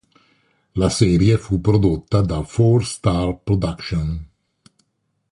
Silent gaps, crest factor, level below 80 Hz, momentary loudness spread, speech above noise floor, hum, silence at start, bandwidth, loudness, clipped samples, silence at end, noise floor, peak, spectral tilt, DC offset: none; 16 dB; -34 dBFS; 8 LU; 53 dB; none; 0.75 s; 11.5 kHz; -19 LUFS; under 0.1%; 1.05 s; -70 dBFS; -2 dBFS; -7 dB/octave; under 0.1%